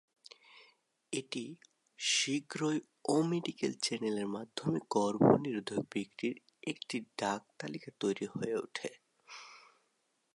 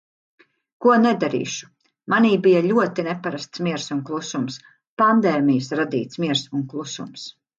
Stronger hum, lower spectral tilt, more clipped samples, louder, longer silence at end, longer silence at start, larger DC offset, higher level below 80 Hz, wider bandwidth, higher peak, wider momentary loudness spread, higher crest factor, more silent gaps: neither; about the same, -4.5 dB/octave vs -5.5 dB/octave; neither; second, -35 LUFS vs -21 LUFS; first, 0.75 s vs 0.3 s; second, 0.55 s vs 0.8 s; neither; second, -76 dBFS vs -68 dBFS; first, 11.5 kHz vs 7.6 kHz; second, -14 dBFS vs -4 dBFS; about the same, 15 LU vs 15 LU; first, 22 dB vs 16 dB; second, none vs 4.89-4.97 s